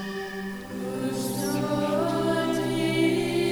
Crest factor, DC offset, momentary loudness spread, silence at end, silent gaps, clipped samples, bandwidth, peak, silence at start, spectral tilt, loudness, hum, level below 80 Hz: 14 dB; under 0.1%; 10 LU; 0 s; none; under 0.1%; over 20 kHz; -12 dBFS; 0 s; -5.5 dB/octave; -27 LUFS; none; -56 dBFS